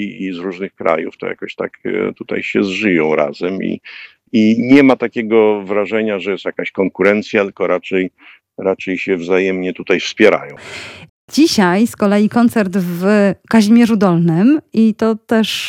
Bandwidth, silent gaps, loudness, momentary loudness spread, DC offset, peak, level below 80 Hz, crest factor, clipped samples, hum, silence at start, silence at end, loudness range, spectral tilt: 16 kHz; 11.09-11.28 s; -15 LUFS; 13 LU; under 0.1%; 0 dBFS; -58 dBFS; 14 dB; under 0.1%; none; 0 s; 0 s; 5 LU; -6 dB/octave